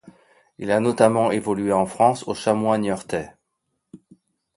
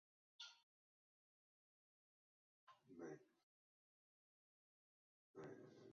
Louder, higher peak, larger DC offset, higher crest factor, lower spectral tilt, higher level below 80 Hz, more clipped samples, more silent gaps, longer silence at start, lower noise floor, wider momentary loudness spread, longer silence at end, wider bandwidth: first, -21 LUFS vs -61 LUFS; first, -2 dBFS vs -46 dBFS; neither; about the same, 22 dB vs 22 dB; first, -6 dB/octave vs -3.5 dB/octave; first, -58 dBFS vs under -90 dBFS; neither; second, none vs 0.63-2.67 s, 3.43-5.34 s; second, 0.05 s vs 0.4 s; second, -76 dBFS vs under -90 dBFS; first, 12 LU vs 7 LU; first, 0.6 s vs 0 s; first, 11.5 kHz vs 6.8 kHz